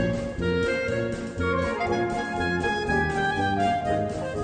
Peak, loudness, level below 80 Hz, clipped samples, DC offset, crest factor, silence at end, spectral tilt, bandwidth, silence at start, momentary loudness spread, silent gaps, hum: -12 dBFS; -26 LUFS; -42 dBFS; under 0.1%; under 0.1%; 14 dB; 0 s; -6 dB/octave; 9.4 kHz; 0 s; 4 LU; none; none